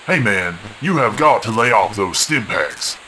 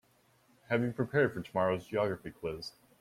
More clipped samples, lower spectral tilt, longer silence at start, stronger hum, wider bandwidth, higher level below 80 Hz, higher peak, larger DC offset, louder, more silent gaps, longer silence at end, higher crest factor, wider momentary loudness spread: neither; second, -3.5 dB/octave vs -7 dB/octave; second, 0 s vs 0.7 s; neither; second, 11 kHz vs 16 kHz; first, -52 dBFS vs -64 dBFS; first, 0 dBFS vs -14 dBFS; neither; first, -16 LUFS vs -33 LUFS; neither; second, 0 s vs 0.3 s; about the same, 16 dB vs 20 dB; second, 7 LU vs 10 LU